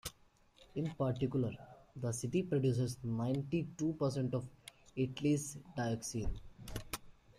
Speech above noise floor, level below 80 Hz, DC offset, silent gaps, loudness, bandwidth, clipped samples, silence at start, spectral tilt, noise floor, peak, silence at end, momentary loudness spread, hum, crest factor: 31 dB; -54 dBFS; under 0.1%; none; -38 LUFS; 15.5 kHz; under 0.1%; 0.05 s; -6.5 dB/octave; -67 dBFS; -22 dBFS; 0.25 s; 14 LU; none; 16 dB